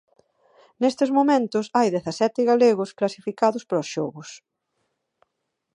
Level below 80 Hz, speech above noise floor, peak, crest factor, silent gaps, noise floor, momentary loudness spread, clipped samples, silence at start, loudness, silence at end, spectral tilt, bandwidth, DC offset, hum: -74 dBFS; 57 dB; -6 dBFS; 18 dB; none; -79 dBFS; 11 LU; under 0.1%; 0.8 s; -22 LUFS; 1.4 s; -5.5 dB/octave; 11 kHz; under 0.1%; none